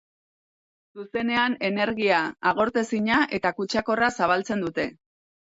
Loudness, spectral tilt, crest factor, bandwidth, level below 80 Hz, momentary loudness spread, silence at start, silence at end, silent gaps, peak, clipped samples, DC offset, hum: -24 LUFS; -4.5 dB/octave; 18 dB; 8 kHz; -60 dBFS; 7 LU; 0.95 s; 0.65 s; none; -8 dBFS; under 0.1%; under 0.1%; none